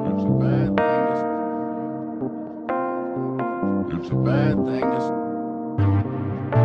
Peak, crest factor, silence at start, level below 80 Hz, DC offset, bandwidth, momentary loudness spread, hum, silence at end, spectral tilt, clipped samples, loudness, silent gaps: -2 dBFS; 20 dB; 0 s; -50 dBFS; under 0.1%; 6 kHz; 9 LU; none; 0 s; -10 dB/octave; under 0.1%; -23 LUFS; none